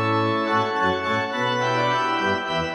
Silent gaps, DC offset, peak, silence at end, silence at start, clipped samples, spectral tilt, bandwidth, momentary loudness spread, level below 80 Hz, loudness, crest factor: none; under 0.1%; -10 dBFS; 0 s; 0 s; under 0.1%; -5 dB/octave; 12.5 kHz; 2 LU; -56 dBFS; -22 LUFS; 14 dB